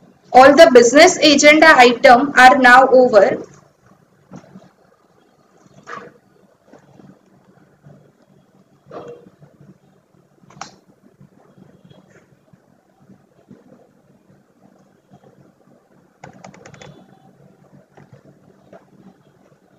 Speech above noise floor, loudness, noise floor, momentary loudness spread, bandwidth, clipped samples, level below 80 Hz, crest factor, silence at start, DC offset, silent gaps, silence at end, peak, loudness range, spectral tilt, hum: 47 dB; -9 LUFS; -55 dBFS; 28 LU; 16 kHz; 0.3%; -54 dBFS; 16 dB; 0.3 s; under 0.1%; none; 10.8 s; 0 dBFS; 12 LU; -2.5 dB/octave; none